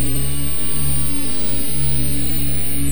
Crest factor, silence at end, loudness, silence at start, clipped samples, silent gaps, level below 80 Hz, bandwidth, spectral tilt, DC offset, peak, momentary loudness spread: 12 dB; 0 s; -20 LUFS; 0 s; under 0.1%; none; -30 dBFS; over 20 kHz; -4 dB/octave; 20%; -6 dBFS; 1 LU